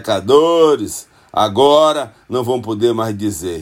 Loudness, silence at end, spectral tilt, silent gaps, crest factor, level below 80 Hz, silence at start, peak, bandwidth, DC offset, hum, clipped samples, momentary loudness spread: -15 LUFS; 0 s; -5 dB/octave; none; 14 dB; -54 dBFS; 0 s; 0 dBFS; 16.5 kHz; under 0.1%; none; under 0.1%; 12 LU